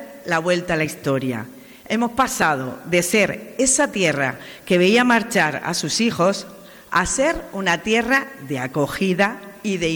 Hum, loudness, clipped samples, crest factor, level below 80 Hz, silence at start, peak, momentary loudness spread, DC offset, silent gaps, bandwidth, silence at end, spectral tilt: none; -20 LUFS; under 0.1%; 16 dB; -48 dBFS; 0 s; -6 dBFS; 9 LU; under 0.1%; none; over 20 kHz; 0 s; -3.5 dB/octave